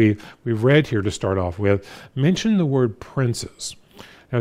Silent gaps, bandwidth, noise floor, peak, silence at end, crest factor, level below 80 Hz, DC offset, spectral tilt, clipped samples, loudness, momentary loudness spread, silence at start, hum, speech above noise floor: none; 14.5 kHz; -46 dBFS; -2 dBFS; 0 s; 18 dB; -52 dBFS; under 0.1%; -6.5 dB/octave; under 0.1%; -21 LUFS; 12 LU; 0 s; none; 25 dB